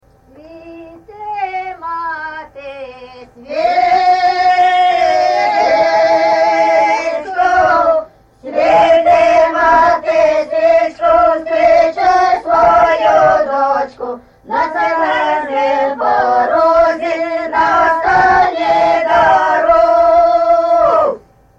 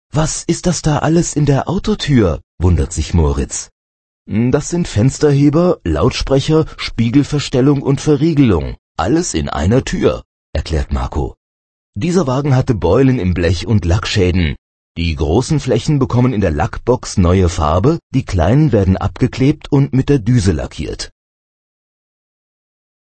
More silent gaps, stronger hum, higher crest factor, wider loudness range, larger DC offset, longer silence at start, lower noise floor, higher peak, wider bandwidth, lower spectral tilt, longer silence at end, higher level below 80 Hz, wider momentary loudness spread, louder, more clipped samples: second, none vs 2.43-2.58 s, 3.72-4.25 s, 8.79-8.95 s, 10.25-10.53 s, 11.37-11.93 s, 14.58-14.95 s, 18.03-18.10 s; neither; about the same, 10 dB vs 14 dB; about the same, 4 LU vs 4 LU; neither; first, 0.45 s vs 0.15 s; second, -41 dBFS vs under -90 dBFS; about the same, -2 dBFS vs 0 dBFS; about the same, 8 kHz vs 8.8 kHz; second, -4.5 dB/octave vs -6.5 dB/octave; second, 0.4 s vs 2.1 s; second, -44 dBFS vs -28 dBFS; first, 12 LU vs 9 LU; first, -12 LUFS vs -15 LUFS; neither